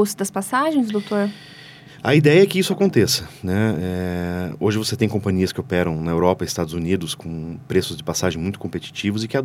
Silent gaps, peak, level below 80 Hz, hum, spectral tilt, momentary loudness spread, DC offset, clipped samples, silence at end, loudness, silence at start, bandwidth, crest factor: none; -2 dBFS; -48 dBFS; none; -5.5 dB/octave; 11 LU; under 0.1%; under 0.1%; 0 s; -21 LUFS; 0 s; 16.5 kHz; 18 dB